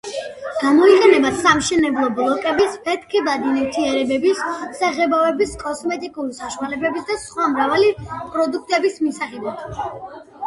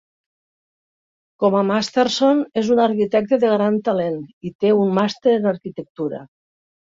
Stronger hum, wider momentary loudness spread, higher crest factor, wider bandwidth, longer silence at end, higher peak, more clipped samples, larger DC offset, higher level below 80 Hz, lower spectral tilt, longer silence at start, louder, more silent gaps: neither; first, 14 LU vs 11 LU; about the same, 18 dB vs 16 dB; first, 11.5 kHz vs 7.8 kHz; second, 0 s vs 0.65 s; first, 0 dBFS vs -4 dBFS; neither; neither; first, -50 dBFS vs -64 dBFS; second, -4 dB/octave vs -6 dB/octave; second, 0.05 s vs 1.4 s; about the same, -18 LUFS vs -19 LUFS; second, none vs 4.33-4.41 s, 4.55-4.59 s, 5.90-5.95 s